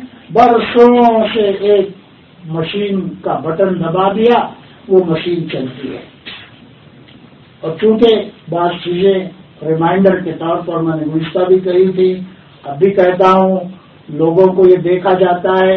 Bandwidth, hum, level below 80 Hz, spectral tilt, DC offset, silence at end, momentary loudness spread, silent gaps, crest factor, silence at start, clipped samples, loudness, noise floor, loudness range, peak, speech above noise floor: 6 kHz; none; -50 dBFS; -8.5 dB/octave; under 0.1%; 0 s; 16 LU; none; 12 dB; 0 s; 0.2%; -12 LUFS; -40 dBFS; 5 LU; 0 dBFS; 29 dB